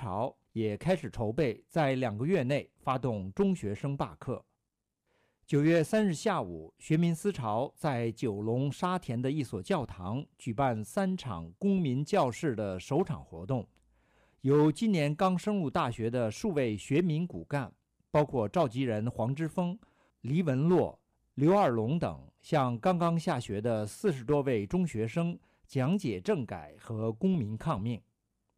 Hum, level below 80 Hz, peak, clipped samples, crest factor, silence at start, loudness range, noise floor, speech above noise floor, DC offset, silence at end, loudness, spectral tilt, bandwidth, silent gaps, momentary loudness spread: none; -60 dBFS; -18 dBFS; under 0.1%; 14 dB; 0 s; 3 LU; -86 dBFS; 56 dB; under 0.1%; 0.6 s; -31 LUFS; -7 dB/octave; 14.5 kHz; none; 10 LU